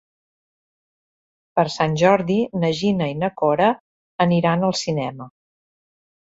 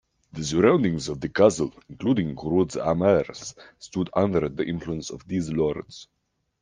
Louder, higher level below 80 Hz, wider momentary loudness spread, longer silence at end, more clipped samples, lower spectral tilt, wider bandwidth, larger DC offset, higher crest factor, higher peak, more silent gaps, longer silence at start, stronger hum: first, -20 LUFS vs -24 LUFS; second, -58 dBFS vs -52 dBFS; second, 9 LU vs 16 LU; first, 1.05 s vs 0.6 s; neither; about the same, -6 dB/octave vs -6 dB/octave; second, 8 kHz vs 10 kHz; neither; about the same, 18 dB vs 22 dB; about the same, -2 dBFS vs -4 dBFS; first, 3.80-4.19 s vs none; first, 1.55 s vs 0.35 s; neither